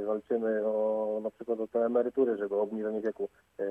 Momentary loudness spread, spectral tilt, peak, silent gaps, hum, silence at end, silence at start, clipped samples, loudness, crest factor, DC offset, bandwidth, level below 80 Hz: 7 LU; -8.5 dB/octave; -16 dBFS; none; none; 0 s; 0 s; under 0.1%; -31 LUFS; 16 dB; under 0.1%; 3.6 kHz; -76 dBFS